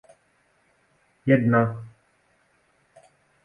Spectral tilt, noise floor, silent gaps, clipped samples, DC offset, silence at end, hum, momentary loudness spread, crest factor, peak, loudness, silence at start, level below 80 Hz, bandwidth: -10 dB/octave; -66 dBFS; none; under 0.1%; under 0.1%; 1.55 s; none; 22 LU; 22 dB; -6 dBFS; -22 LUFS; 1.25 s; -64 dBFS; 9.8 kHz